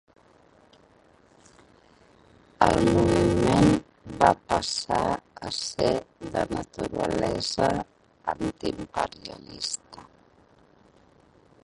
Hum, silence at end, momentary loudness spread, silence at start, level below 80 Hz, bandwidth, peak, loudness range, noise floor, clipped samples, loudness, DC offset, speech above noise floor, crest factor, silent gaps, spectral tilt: none; 1.65 s; 12 LU; 2.6 s; -46 dBFS; 11.5 kHz; -2 dBFS; 11 LU; -58 dBFS; under 0.1%; -26 LUFS; under 0.1%; 32 dB; 24 dB; none; -5 dB/octave